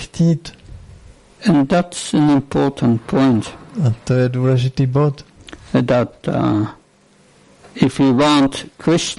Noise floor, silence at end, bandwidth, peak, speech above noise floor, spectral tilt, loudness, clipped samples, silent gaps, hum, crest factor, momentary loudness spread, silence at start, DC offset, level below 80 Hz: -52 dBFS; 0.05 s; 11.5 kHz; -2 dBFS; 36 dB; -6.5 dB/octave; -17 LUFS; under 0.1%; none; none; 16 dB; 8 LU; 0 s; under 0.1%; -44 dBFS